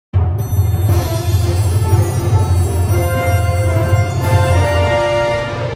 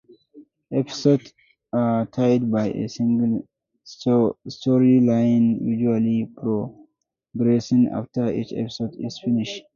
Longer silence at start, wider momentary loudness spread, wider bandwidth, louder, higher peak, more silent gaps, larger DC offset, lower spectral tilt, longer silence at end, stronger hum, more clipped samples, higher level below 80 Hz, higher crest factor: second, 0.15 s vs 0.35 s; second, 3 LU vs 10 LU; first, 15.5 kHz vs 7.2 kHz; first, -15 LUFS vs -22 LUFS; first, 0 dBFS vs -4 dBFS; neither; neither; about the same, -6.5 dB/octave vs -7.5 dB/octave; second, 0 s vs 0.15 s; neither; neither; first, -26 dBFS vs -60 dBFS; about the same, 12 dB vs 16 dB